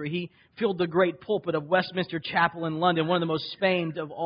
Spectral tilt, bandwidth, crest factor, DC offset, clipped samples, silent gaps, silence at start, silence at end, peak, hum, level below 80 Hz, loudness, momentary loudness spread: -10 dB/octave; 5.4 kHz; 18 dB; under 0.1%; under 0.1%; none; 0 s; 0 s; -8 dBFS; none; -66 dBFS; -26 LUFS; 6 LU